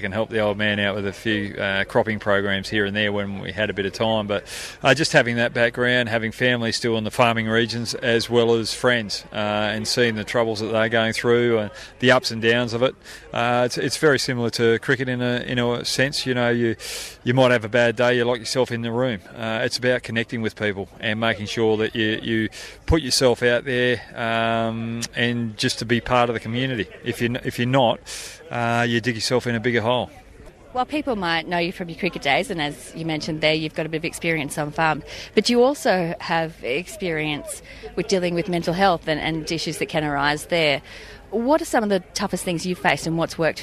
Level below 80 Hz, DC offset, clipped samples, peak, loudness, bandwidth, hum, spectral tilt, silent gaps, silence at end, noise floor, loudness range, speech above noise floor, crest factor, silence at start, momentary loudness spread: -46 dBFS; under 0.1%; under 0.1%; -2 dBFS; -22 LUFS; 14 kHz; none; -4.5 dB/octave; none; 0 s; -44 dBFS; 3 LU; 23 dB; 20 dB; 0 s; 8 LU